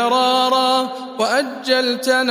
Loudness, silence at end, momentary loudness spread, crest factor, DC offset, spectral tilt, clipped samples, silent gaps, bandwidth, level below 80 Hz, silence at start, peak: -17 LUFS; 0 s; 5 LU; 14 dB; under 0.1%; -2 dB/octave; under 0.1%; none; 15.5 kHz; -78 dBFS; 0 s; -2 dBFS